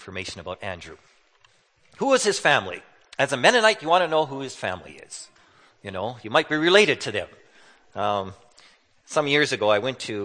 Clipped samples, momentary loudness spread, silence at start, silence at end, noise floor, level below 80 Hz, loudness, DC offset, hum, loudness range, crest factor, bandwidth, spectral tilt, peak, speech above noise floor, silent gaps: under 0.1%; 21 LU; 0 s; 0 s; -61 dBFS; -64 dBFS; -22 LUFS; under 0.1%; none; 4 LU; 24 dB; 9.8 kHz; -3 dB/octave; -2 dBFS; 38 dB; none